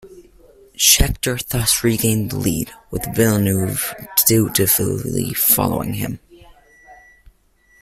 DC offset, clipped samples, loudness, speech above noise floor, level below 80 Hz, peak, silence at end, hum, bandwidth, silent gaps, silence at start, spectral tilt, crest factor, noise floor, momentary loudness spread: under 0.1%; under 0.1%; -17 LUFS; 38 dB; -34 dBFS; 0 dBFS; 0.85 s; none; 16 kHz; none; 0.05 s; -3.5 dB/octave; 20 dB; -56 dBFS; 11 LU